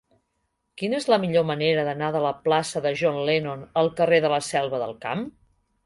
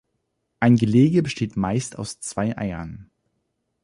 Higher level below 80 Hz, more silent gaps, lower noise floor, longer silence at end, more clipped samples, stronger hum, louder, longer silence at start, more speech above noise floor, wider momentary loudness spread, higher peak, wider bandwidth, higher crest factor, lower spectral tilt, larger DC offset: second, -62 dBFS vs -50 dBFS; neither; about the same, -75 dBFS vs -75 dBFS; second, 0.55 s vs 0.8 s; neither; neither; about the same, -24 LUFS vs -22 LUFS; first, 0.75 s vs 0.6 s; about the same, 52 dB vs 54 dB; second, 9 LU vs 15 LU; about the same, -6 dBFS vs -6 dBFS; about the same, 11.5 kHz vs 11.5 kHz; about the same, 18 dB vs 18 dB; second, -5 dB/octave vs -6.5 dB/octave; neither